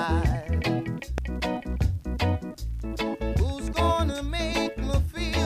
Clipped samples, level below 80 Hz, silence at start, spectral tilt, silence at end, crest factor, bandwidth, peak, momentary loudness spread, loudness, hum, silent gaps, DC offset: under 0.1%; -32 dBFS; 0 s; -6 dB/octave; 0 s; 16 dB; 15 kHz; -10 dBFS; 8 LU; -28 LUFS; none; none; under 0.1%